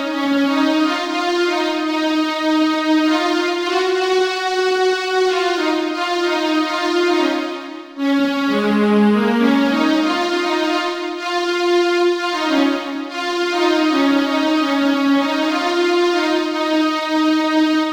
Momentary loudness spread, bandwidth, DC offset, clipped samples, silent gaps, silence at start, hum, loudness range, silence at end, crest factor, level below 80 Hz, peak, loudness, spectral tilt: 4 LU; 16.5 kHz; under 0.1%; under 0.1%; none; 0 s; none; 2 LU; 0 s; 14 dB; -64 dBFS; -4 dBFS; -17 LUFS; -4.5 dB/octave